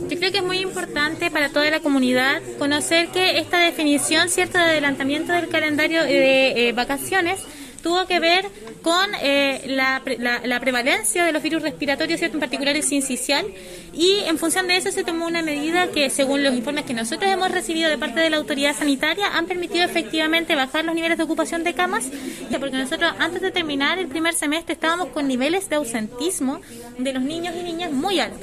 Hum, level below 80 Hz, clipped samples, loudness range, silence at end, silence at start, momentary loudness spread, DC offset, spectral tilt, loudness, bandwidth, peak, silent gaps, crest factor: none; -52 dBFS; under 0.1%; 4 LU; 0 s; 0 s; 8 LU; under 0.1%; -2 dB/octave; -20 LUFS; 14.5 kHz; -6 dBFS; none; 16 dB